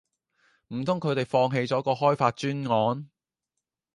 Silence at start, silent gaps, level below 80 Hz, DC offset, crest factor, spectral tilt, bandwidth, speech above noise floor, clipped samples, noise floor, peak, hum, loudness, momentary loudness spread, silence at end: 0.7 s; none; -68 dBFS; under 0.1%; 20 dB; -6.5 dB/octave; 11 kHz; 60 dB; under 0.1%; -86 dBFS; -8 dBFS; none; -26 LUFS; 8 LU; 0.9 s